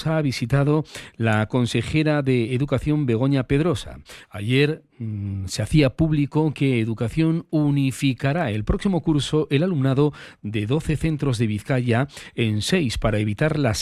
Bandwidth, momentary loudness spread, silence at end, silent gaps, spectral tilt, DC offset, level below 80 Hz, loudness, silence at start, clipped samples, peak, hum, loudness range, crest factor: 13 kHz; 8 LU; 0 s; none; -6.5 dB/octave; under 0.1%; -40 dBFS; -22 LUFS; 0 s; under 0.1%; -6 dBFS; none; 1 LU; 16 dB